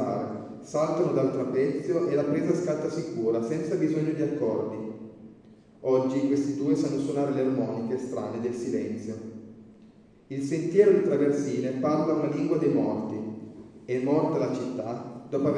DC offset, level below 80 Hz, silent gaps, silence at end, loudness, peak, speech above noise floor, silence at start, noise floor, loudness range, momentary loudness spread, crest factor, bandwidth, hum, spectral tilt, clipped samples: under 0.1%; -68 dBFS; none; 0 s; -27 LUFS; -8 dBFS; 28 dB; 0 s; -54 dBFS; 4 LU; 12 LU; 20 dB; 10 kHz; none; -7.5 dB/octave; under 0.1%